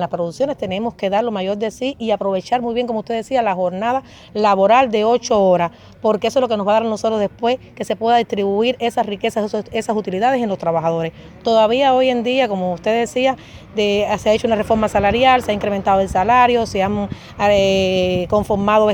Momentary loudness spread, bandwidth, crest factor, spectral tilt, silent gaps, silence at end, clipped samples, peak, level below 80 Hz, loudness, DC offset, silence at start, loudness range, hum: 8 LU; 18.5 kHz; 16 dB; -5.5 dB/octave; none; 0 s; under 0.1%; 0 dBFS; -44 dBFS; -17 LUFS; under 0.1%; 0 s; 4 LU; none